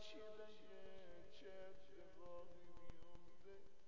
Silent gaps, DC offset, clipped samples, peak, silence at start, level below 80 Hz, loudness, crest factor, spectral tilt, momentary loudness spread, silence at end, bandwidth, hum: none; 0.3%; under 0.1%; -40 dBFS; 0 s; -72 dBFS; -62 LUFS; 16 dB; -3.5 dB/octave; 7 LU; 0 s; 7.2 kHz; none